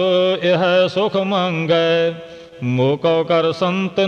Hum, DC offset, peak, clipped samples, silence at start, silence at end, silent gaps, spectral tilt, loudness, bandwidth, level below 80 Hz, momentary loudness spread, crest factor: none; under 0.1%; -6 dBFS; under 0.1%; 0 s; 0 s; none; -6.5 dB/octave; -17 LUFS; 8.2 kHz; -60 dBFS; 7 LU; 12 dB